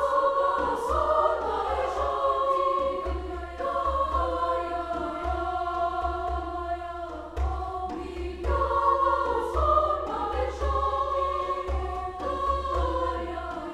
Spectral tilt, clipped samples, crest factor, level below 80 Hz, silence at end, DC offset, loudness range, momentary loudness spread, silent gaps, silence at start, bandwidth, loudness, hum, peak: -6.5 dB/octave; under 0.1%; 18 dB; -36 dBFS; 0 s; under 0.1%; 5 LU; 9 LU; none; 0 s; 11.5 kHz; -28 LUFS; none; -10 dBFS